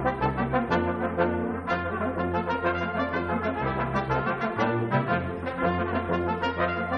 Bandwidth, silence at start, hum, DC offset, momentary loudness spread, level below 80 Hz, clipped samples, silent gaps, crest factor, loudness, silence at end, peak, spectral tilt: 9.4 kHz; 0 s; none; under 0.1%; 3 LU; -46 dBFS; under 0.1%; none; 16 dB; -27 LUFS; 0 s; -10 dBFS; -8 dB/octave